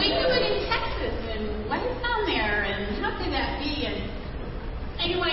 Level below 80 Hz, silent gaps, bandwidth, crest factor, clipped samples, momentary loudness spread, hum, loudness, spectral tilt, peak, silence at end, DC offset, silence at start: -36 dBFS; none; 5.8 kHz; 16 dB; under 0.1%; 12 LU; none; -27 LUFS; -8.5 dB/octave; -12 dBFS; 0 s; under 0.1%; 0 s